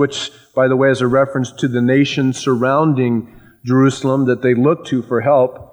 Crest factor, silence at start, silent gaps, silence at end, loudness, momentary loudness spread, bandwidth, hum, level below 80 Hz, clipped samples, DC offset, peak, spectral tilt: 12 dB; 0 s; none; 0.1 s; -15 LUFS; 6 LU; 10.5 kHz; none; -56 dBFS; under 0.1%; under 0.1%; -2 dBFS; -6.5 dB/octave